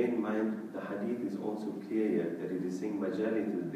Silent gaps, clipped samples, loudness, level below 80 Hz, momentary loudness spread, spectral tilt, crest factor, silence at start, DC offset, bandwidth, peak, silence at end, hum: none; under 0.1%; -35 LUFS; -84 dBFS; 6 LU; -8 dB/octave; 16 dB; 0 s; under 0.1%; 14.5 kHz; -18 dBFS; 0 s; none